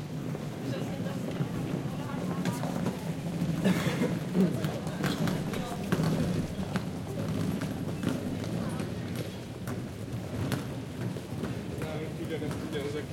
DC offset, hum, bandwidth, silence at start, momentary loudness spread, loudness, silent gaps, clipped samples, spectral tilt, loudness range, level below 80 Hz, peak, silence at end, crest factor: under 0.1%; none; 16.5 kHz; 0 s; 8 LU; -33 LUFS; none; under 0.1%; -6.5 dB/octave; 5 LU; -54 dBFS; -12 dBFS; 0 s; 20 dB